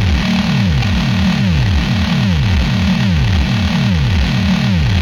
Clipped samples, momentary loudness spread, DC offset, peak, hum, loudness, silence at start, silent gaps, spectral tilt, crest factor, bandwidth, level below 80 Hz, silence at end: under 0.1%; 1 LU; under 0.1%; -2 dBFS; none; -14 LUFS; 0 s; none; -6 dB/octave; 10 dB; 13.5 kHz; -20 dBFS; 0 s